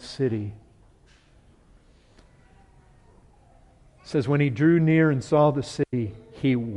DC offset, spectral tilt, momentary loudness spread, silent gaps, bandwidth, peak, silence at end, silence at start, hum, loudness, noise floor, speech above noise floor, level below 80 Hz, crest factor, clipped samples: under 0.1%; -8 dB/octave; 11 LU; none; 11 kHz; -8 dBFS; 0 s; 0 s; none; -23 LUFS; -56 dBFS; 34 dB; -56 dBFS; 18 dB; under 0.1%